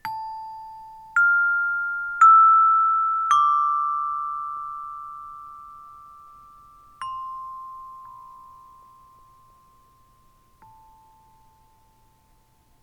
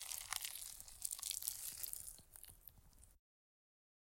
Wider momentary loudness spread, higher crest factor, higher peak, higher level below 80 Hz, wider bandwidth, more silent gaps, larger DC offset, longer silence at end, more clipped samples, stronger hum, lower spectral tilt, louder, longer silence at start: first, 27 LU vs 17 LU; second, 18 dB vs 32 dB; first, -6 dBFS vs -18 dBFS; first, -64 dBFS vs -70 dBFS; second, 12 kHz vs 17 kHz; neither; neither; first, 4.55 s vs 0.95 s; neither; neither; first, 0 dB/octave vs 1.5 dB/octave; first, -19 LUFS vs -45 LUFS; about the same, 0.05 s vs 0 s